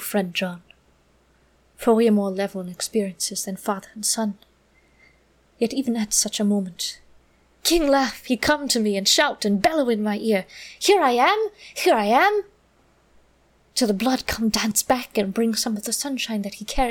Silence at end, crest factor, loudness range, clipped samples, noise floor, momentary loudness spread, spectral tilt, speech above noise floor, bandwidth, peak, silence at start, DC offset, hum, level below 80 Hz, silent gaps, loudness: 0 s; 18 dB; 6 LU; under 0.1%; -60 dBFS; 11 LU; -3 dB/octave; 38 dB; 19 kHz; -6 dBFS; 0 s; under 0.1%; none; -46 dBFS; none; -22 LUFS